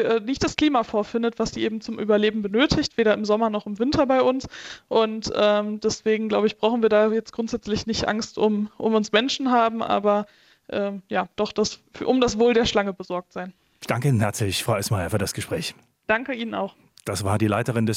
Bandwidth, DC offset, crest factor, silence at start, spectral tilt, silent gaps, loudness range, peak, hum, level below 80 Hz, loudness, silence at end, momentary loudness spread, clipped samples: 16 kHz; under 0.1%; 18 dB; 0 s; -5 dB/octave; none; 3 LU; -4 dBFS; none; -50 dBFS; -23 LUFS; 0 s; 10 LU; under 0.1%